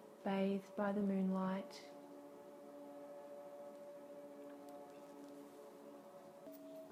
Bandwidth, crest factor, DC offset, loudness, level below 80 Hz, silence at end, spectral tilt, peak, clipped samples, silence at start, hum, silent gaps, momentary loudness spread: 15.5 kHz; 18 dB; under 0.1%; -45 LUFS; -88 dBFS; 0 s; -7.5 dB/octave; -26 dBFS; under 0.1%; 0 s; none; none; 18 LU